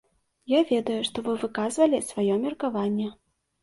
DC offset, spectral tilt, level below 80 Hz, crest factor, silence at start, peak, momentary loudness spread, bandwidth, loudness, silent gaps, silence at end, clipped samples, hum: under 0.1%; -5 dB/octave; -66 dBFS; 18 dB; 0.5 s; -8 dBFS; 6 LU; 11.5 kHz; -26 LUFS; none; 0.5 s; under 0.1%; none